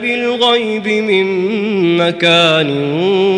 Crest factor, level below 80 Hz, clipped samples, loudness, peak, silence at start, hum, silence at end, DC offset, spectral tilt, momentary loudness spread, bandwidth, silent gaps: 12 dB; -60 dBFS; under 0.1%; -13 LUFS; 0 dBFS; 0 s; none; 0 s; under 0.1%; -5 dB/octave; 6 LU; 10.5 kHz; none